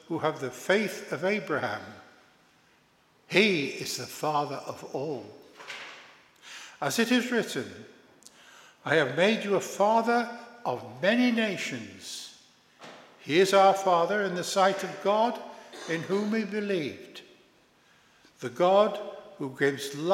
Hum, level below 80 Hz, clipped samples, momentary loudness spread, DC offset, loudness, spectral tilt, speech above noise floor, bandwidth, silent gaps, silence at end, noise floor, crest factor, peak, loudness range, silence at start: none; -80 dBFS; under 0.1%; 21 LU; under 0.1%; -27 LUFS; -4 dB/octave; 37 dB; 16 kHz; none; 0 s; -64 dBFS; 22 dB; -6 dBFS; 6 LU; 0.1 s